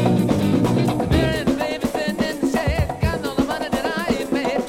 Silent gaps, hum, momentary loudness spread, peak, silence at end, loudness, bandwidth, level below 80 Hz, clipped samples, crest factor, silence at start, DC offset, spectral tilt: none; none; 4 LU; -4 dBFS; 0 s; -21 LUFS; 16.5 kHz; -34 dBFS; under 0.1%; 16 dB; 0 s; under 0.1%; -6.5 dB/octave